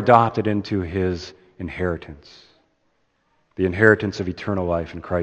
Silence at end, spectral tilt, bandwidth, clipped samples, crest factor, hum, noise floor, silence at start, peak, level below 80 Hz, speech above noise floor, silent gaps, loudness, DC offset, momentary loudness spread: 0 s; -7.5 dB/octave; 8.4 kHz; under 0.1%; 22 dB; none; -67 dBFS; 0 s; 0 dBFS; -46 dBFS; 46 dB; none; -21 LUFS; under 0.1%; 20 LU